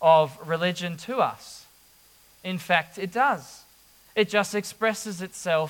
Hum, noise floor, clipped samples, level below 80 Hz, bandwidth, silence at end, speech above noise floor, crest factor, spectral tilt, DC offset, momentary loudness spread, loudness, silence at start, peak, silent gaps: none; -57 dBFS; under 0.1%; -70 dBFS; 18 kHz; 0 s; 32 dB; 20 dB; -4 dB/octave; under 0.1%; 13 LU; -26 LUFS; 0 s; -6 dBFS; none